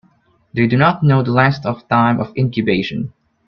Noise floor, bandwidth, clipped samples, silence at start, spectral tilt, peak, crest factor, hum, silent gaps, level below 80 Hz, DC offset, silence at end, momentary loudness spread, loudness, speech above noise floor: -56 dBFS; 6.2 kHz; under 0.1%; 0.55 s; -9 dB/octave; 0 dBFS; 16 dB; none; none; -50 dBFS; under 0.1%; 0.4 s; 11 LU; -16 LUFS; 41 dB